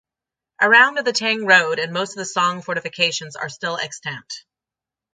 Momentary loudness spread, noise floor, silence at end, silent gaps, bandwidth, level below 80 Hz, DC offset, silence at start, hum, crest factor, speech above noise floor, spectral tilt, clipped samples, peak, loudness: 17 LU; -88 dBFS; 0.75 s; none; 9.6 kHz; -72 dBFS; under 0.1%; 0.6 s; none; 20 dB; 69 dB; -2 dB/octave; under 0.1%; 0 dBFS; -18 LUFS